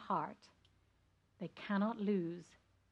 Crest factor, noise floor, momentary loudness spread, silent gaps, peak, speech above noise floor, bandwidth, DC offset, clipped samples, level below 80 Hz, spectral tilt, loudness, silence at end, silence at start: 18 dB; -75 dBFS; 15 LU; none; -24 dBFS; 35 dB; 8 kHz; under 0.1%; under 0.1%; -80 dBFS; -8 dB/octave; -40 LUFS; 0.5 s; 0 s